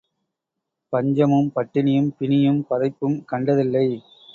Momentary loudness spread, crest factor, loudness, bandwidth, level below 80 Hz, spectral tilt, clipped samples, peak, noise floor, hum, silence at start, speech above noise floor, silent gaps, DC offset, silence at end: 6 LU; 16 dB; -21 LUFS; 6.6 kHz; -62 dBFS; -9.5 dB/octave; under 0.1%; -4 dBFS; -82 dBFS; none; 0.9 s; 62 dB; none; under 0.1%; 0.35 s